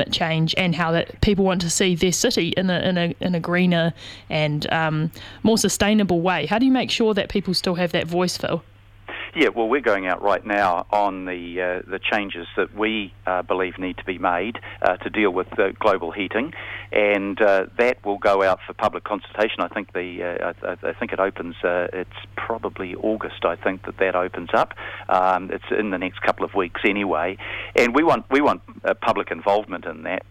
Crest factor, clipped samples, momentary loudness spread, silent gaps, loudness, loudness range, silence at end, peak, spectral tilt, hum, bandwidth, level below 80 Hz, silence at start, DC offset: 20 dB; under 0.1%; 9 LU; none; -22 LUFS; 5 LU; 0.1 s; -2 dBFS; -4.5 dB/octave; none; 16 kHz; -46 dBFS; 0 s; under 0.1%